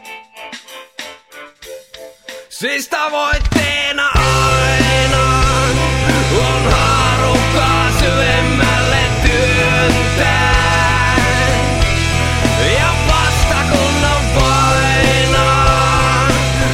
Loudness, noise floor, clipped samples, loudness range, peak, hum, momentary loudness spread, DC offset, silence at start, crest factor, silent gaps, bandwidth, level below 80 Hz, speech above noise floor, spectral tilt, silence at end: -13 LUFS; -37 dBFS; under 0.1%; 5 LU; 0 dBFS; none; 18 LU; under 0.1%; 0.05 s; 14 dB; none; 16 kHz; -22 dBFS; 21 dB; -4 dB/octave; 0 s